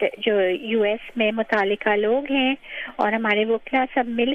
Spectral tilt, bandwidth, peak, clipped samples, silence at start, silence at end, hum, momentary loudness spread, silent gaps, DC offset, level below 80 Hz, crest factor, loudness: -6.5 dB/octave; 6.2 kHz; -6 dBFS; under 0.1%; 0 s; 0 s; none; 3 LU; none; under 0.1%; -58 dBFS; 16 dB; -22 LUFS